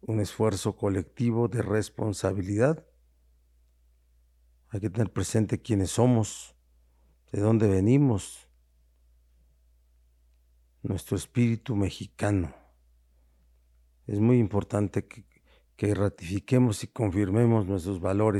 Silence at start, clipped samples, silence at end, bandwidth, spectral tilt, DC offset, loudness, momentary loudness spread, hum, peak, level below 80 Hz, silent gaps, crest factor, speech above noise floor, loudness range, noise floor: 0.05 s; under 0.1%; 0 s; 13 kHz; -7 dB/octave; under 0.1%; -27 LUFS; 12 LU; none; -8 dBFS; -54 dBFS; none; 20 dB; 37 dB; 6 LU; -63 dBFS